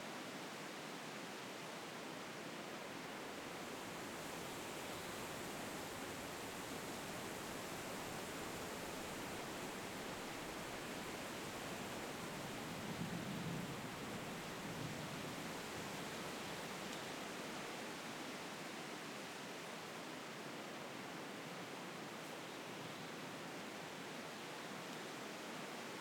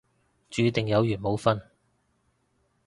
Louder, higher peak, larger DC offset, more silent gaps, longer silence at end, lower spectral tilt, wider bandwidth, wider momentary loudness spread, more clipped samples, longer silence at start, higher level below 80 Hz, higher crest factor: second, -47 LUFS vs -26 LUFS; second, -32 dBFS vs -6 dBFS; neither; neither; second, 0 s vs 1.25 s; second, -3.5 dB/octave vs -6.5 dB/octave; first, 19 kHz vs 11.5 kHz; second, 3 LU vs 6 LU; neither; second, 0 s vs 0.5 s; second, -72 dBFS vs -56 dBFS; second, 16 dB vs 22 dB